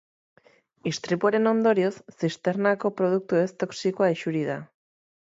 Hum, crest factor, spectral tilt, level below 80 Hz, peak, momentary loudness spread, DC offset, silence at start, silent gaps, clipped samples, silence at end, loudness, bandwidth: none; 18 dB; -6 dB/octave; -74 dBFS; -8 dBFS; 10 LU; under 0.1%; 0.85 s; none; under 0.1%; 0.75 s; -25 LUFS; 8 kHz